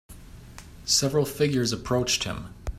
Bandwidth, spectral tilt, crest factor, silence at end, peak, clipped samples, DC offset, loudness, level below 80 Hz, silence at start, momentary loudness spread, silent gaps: 16 kHz; -3.5 dB/octave; 18 dB; 0 s; -10 dBFS; under 0.1%; under 0.1%; -24 LUFS; -44 dBFS; 0.1 s; 14 LU; none